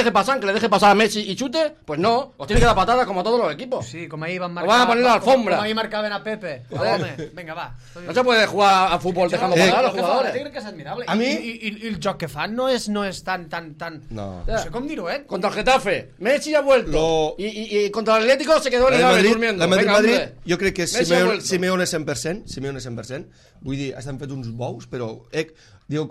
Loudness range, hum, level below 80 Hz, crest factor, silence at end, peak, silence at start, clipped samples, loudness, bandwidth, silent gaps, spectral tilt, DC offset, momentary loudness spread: 9 LU; none; -38 dBFS; 16 dB; 0 s; -4 dBFS; 0 s; under 0.1%; -20 LUFS; 15 kHz; none; -4.5 dB/octave; under 0.1%; 16 LU